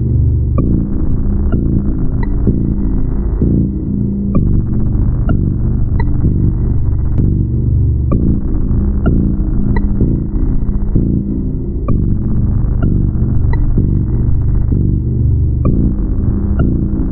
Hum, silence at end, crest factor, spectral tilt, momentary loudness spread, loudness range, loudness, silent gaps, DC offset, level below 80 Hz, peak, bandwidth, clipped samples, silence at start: none; 0 s; 10 dB; -12.5 dB/octave; 3 LU; 1 LU; -15 LUFS; none; under 0.1%; -16 dBFS; 0 dBFS; 2.5 kHz; under 0.1%; 0 s